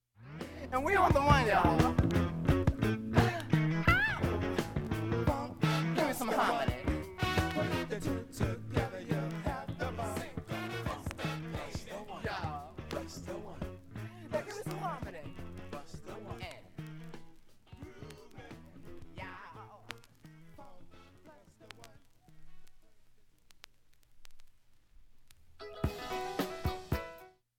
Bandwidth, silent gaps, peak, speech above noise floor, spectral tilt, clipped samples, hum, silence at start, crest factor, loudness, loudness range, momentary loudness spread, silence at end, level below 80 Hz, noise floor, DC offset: 17.5 kHz; none; -12 dBFS; 33 dB; -6 dB/octave; under 0.1%; none; 0.2 s; 24 dB; -34 LUFS; 21 LU; 23 LU; 0.3 s; -48 dBFS; -61 dBFS; under 0.1%